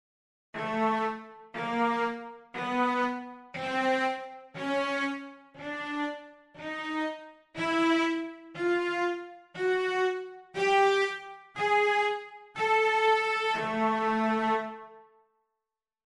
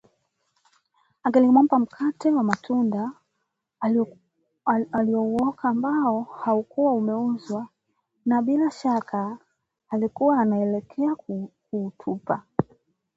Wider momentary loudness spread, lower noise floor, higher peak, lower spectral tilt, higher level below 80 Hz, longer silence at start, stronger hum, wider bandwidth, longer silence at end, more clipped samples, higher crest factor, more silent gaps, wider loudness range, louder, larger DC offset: first, 17 LU vs 11 LU; first, -89 dBFS vs -78 dBFS; second, -14 dBFS vs -2 dBFS; second, -4.5 dB/octave vs -8 dB/octave; second, -72 dBFS vs -66 dBFS; second, 0.55 s vs 1.25 s; neither; first, 11.5 kHz vs 7.8 kHz; first, 1.05 s vs 0.55 s; neither; second, 16 dB vs 22 dB; neither; first, 6 LU vs 3 LU; second, -29 LUFS vs -24 LUFS; neither